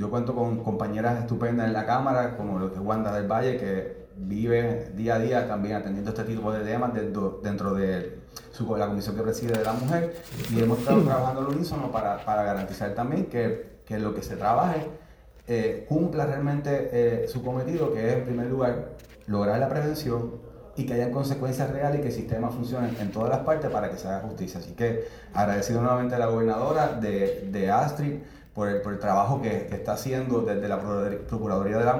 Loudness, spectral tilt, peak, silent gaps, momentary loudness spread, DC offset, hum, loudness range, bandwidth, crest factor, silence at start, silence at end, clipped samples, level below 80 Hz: -27 LUFS; -7.5 dB/octave; -8 dBFS; none; 8 LU; under 0.1%; none; 3 LU; over 20 kHz; 18 dB; 0 s; 0 s; under 0.1%; -50 dBFS